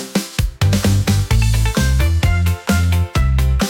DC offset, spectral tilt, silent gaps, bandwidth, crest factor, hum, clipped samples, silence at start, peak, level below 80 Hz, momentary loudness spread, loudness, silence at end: under 0.1%; -5.5 dB/octave; none; 17 kHz; 10 dB; none; under 0.1%; 0 s; -4 dBFS; -20 dBFS; 3 LU; -16 LUFS; 0 s